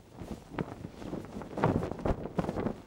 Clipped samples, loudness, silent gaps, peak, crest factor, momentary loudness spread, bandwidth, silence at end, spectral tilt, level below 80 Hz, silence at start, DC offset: under 0.1%; -36 LUFS; none; -12 dBFS; 24 dB; 12 LU; 16.5 kHz; 0 s; -8 dB/octave; -48 dBFS; 0 s; under 0.1%